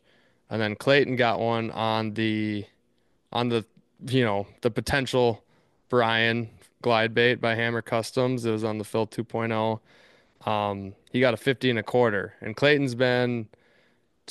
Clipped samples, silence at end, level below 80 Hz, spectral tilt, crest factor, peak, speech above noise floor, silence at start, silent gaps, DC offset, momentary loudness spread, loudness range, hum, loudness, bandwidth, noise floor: under 0.1%; 0.85 s; -60 dBFS; -6 dB/octave; 20 dB; -6 dBFS; 45 dB; 0.5 s; none; under 0.1%; 10 LU; 3 LU; none; -25 LUFS; 12.5 kHz; -70 dBFS